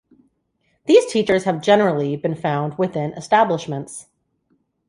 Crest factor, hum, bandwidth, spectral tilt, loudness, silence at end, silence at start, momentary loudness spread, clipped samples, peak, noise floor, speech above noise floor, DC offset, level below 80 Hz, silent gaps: 18 dB; none; 11.5 kHz; -5.5 dB/octave; -19 LUFS; 0.85 s; 0.85 s; 14 LU; under 0.1%; -2 dBFS; -68 dBFS; 49 dB; under 0.1%; -62 dBFS; none